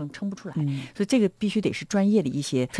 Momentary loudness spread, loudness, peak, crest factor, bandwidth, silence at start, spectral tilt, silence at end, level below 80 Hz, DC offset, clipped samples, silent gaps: 9 LU; -25 LUFS; -10 dBFS; 16 dB; 11 kHz; 0 s; -6 dB/octave; 0 s; -62 dBFS; under 0.1%; under 0.1%; none